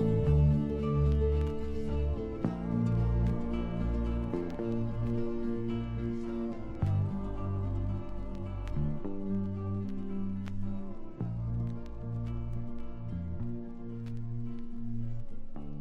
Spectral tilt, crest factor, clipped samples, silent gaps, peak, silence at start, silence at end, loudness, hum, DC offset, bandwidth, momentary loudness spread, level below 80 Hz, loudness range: -10 dB/octave; 16 dB; under 0.1%; none; -16 dBFS; 0 s; 0 s; -34 LUFS; none; under 0.1%; 5.6 kHz; 12 LU; -38 dBFS; 7 LU